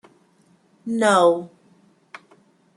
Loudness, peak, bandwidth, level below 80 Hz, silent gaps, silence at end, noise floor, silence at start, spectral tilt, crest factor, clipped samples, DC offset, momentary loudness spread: -19 LUFS; -4 dBFS; 12 kHz; -76 dBFS; none; 1.3 s; -59 dBFS; 0.85 s; -4.5 dB/octave; 20 dB; under 0.1%; under 0.1%; 22 LU